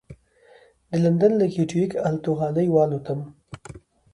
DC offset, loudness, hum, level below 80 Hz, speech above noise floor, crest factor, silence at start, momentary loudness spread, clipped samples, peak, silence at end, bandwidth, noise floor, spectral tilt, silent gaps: under 0.1%; -22 LUFS; none; -58 dBFS; 33 dB; 16 dB; 0.1 s; 21 LU; under 0.1%; -8 dBFS; 0.35 s; 11 kHz; -54 dBFS; -8.5 dB/octave; none